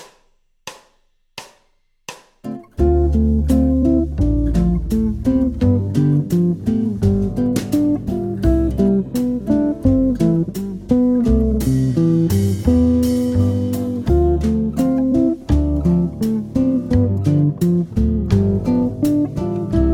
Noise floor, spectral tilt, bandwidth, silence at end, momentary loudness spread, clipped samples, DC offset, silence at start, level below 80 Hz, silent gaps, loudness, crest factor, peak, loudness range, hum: -60 dBFS; -8.5 dB/octave; 17 kHz; 0 s; 7 LU; under 0.1%; under 0.1%; 0 s; -26 dBFS; none; -17 LUFS; 14 dB; -2 dBFS; 2 LU; none